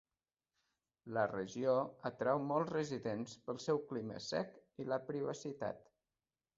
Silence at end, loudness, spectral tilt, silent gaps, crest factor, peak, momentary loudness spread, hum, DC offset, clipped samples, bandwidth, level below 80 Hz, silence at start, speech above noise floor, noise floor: 0.75 s; -40 LUFS; -5 dB/octave; none; 20 dB; -22 dBFS; 9 LU; none; under 0.1%; under 0.1%; 7.6 kHz; -78 dBFS; 1.05 s; over 51 dB; under -90 dBFS